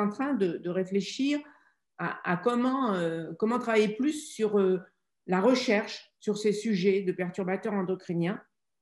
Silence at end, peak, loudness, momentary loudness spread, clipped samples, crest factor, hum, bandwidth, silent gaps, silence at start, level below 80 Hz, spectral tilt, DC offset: 0.4 s; -12 dBFS; -29 LUFS; 8 LU; under 0.1%; 18 dB; none; 12 kHz; none; 0 s; -78 dBFS; -6 dB/octave; under 0.1%